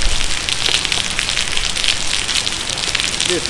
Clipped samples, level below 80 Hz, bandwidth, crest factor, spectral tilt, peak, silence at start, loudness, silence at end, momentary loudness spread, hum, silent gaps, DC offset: under 0.1%; -28 dBFS; 12 kHz; 18 dB; -0.5 dB/octave; 0 dBFS; 0 s; -16 LUFS; 0 s; 3 LU; none; none; under 0.1%